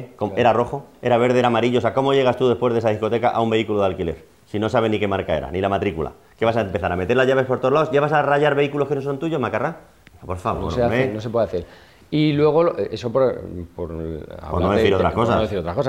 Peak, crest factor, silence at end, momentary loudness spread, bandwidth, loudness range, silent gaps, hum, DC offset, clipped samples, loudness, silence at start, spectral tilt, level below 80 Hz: -4 dBFS; 16 dB; 0 s; 12 LU; 13 kHz; 4 LU; none; none; 0.1%; under 0.1%; -20 LUFS; 0 s; -7 dB/octave; -44 dBFS